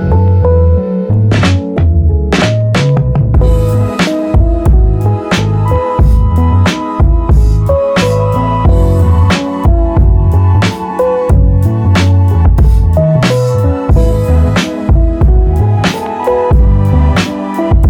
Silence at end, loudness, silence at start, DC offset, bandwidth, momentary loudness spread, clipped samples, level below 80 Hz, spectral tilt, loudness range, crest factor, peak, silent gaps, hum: 0 s; -10 LUFS; 0 s; under 0.1%; 11.5 kHz; 3 LU; under 0.1%; -12 dBFS; -7 dB/octave; 1 LU; 8 dB; 0 dBFS; none; none